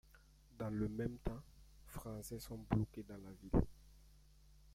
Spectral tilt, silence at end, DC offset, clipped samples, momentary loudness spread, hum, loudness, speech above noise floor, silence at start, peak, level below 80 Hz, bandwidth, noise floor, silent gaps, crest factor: -7.5 dB/octave; 0 s; under 0.1%; under 0.1%; 15 LU; none; -44 LUFS; 24 dB; 0.15 s; -20 dBFS; -52 dBFS; 16 kHz; -66 dBFS; none; 24 dB